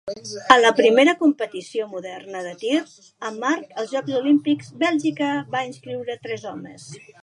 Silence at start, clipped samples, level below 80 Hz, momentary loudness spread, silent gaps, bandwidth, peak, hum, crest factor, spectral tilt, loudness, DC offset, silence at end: 0.05 s; under 0.1%; -66 dBFS; 18 LU; none; 11 kHz; 0 dBFS; none; 22 dB; -4 dB/octave; -21 LUFS; under 0.1%; 0.25 s